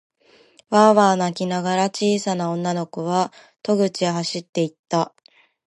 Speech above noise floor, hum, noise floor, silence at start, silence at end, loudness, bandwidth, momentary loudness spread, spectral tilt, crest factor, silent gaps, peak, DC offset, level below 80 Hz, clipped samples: 34 dB; none; -54 dBFS; 0.7 s; 0.6 s; -21 LUFS; 11.5 kHz; 10 LU; -5 dB/octave; 20 dB; 4.49-4.53 s, 4.79-4.83 s; -2 dBFS; under 0.1%; -70 dBFS; under 0.1%